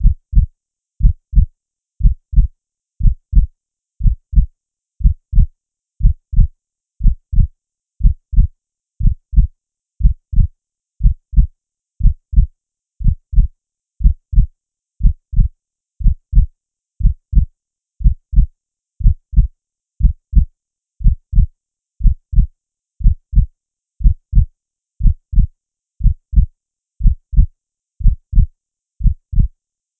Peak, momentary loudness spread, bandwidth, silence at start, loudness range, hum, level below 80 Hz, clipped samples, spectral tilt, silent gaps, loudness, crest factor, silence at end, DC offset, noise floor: 0 dBFS; 5 LU; 0.4 kHz; 0 s; 1 LU; none; -16 dBFS; under 0.1%; -15.5 dB/octave; none; -19 LUFS; 14 dB; 0.5 s; under 0.1%; -67 dBFS